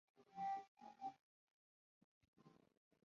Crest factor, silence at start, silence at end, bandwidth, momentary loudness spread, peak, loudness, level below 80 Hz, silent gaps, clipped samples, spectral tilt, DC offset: 16 dB; 0.2 s; 0.55 s; 7.2 kHz; 14 LU; -40 dBFS; -51 LUFS; under -90 dBFS; 0.68-0.77 s, 1.21-2.21 s, 2.28-2.33 s; under 0.1%; -3.5 dB/octave; under 0.1%